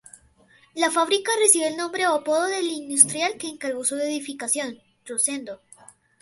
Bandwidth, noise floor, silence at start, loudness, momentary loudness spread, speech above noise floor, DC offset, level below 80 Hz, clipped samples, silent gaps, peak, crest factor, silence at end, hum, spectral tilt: 12 kHz; -57 dBFS; 0.75 s; -22 LUFS; 14 LU; 34 dB; under 0.1%; -72 dBFS; under 0.1%; none; 0 dBFS; 24 dB; 0.65 s; none; -0.5 dB/octave